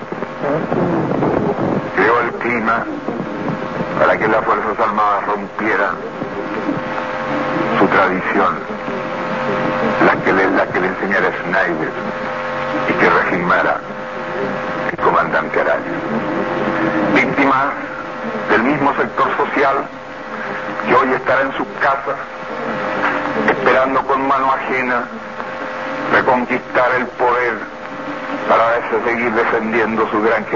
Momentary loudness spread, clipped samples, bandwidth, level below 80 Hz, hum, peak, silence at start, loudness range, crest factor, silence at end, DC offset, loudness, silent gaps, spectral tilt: 10 LU; under 0.1%; 7.4 kHz; -50 dBFS; none; 0 dBFS; 0 s; 2 LU; 16 dB; 0 s; 0.5%; -17 LUFS; none; -6.5 dB/octave